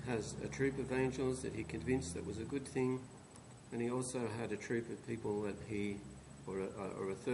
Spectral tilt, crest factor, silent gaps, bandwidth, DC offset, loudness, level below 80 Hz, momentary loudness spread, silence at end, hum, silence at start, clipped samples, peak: -6 dB/octave; 18 dB; none; 11.5 kHz; under 0.1%; -41 LUFS; -60 dBFS; 10 LU; 0 s; none; 0 s; under 0.1%; -22 dBFS